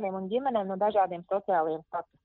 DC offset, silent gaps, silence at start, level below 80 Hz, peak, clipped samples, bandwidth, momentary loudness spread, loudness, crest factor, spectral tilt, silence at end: under 0.1%; none; 0 s; -72 dBFS; -14 dBFS; under 0.1%; 4.2 kHz; 7 LU; -29 LUFS; 16 dB; -5 dB/octave; 0.2 s